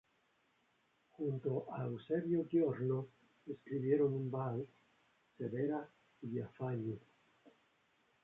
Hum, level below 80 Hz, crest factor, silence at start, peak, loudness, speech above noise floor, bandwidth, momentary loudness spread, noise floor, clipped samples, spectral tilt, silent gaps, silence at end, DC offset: none; -80 dBFS; 20 dB; 1.2 s; -22 dBFS; -39 LUFS; 39 dB; 4 kHz; 17 LU; -77 dBFS; under 0.1%; -9.5 dB/octave; none; 0.75 s; under 0.1%